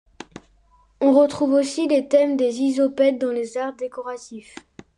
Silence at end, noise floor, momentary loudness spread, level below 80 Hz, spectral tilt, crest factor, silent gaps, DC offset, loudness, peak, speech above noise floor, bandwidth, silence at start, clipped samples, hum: 0.6 s; -57 dBFS; 21 LU; -62 dBFS; -4.5 dB/octave; 16 dB; none; under 0.1%; -20 LUFS; -6 dBFS; 37 dB; 11 kHz; 0.35 s; under 0.1%; none